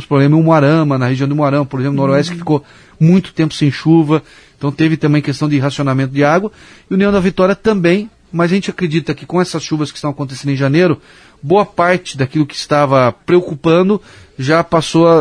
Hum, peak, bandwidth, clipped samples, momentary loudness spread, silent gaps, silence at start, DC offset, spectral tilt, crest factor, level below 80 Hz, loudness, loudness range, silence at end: none; 0 dBFS; 10.5 kHz; under 0.1%; 8 LU; none; 0 s; under 0.1%; -7 dB/octave; 14 dB; -46 dBFS; -14 LUFS; 3 LU; 0 s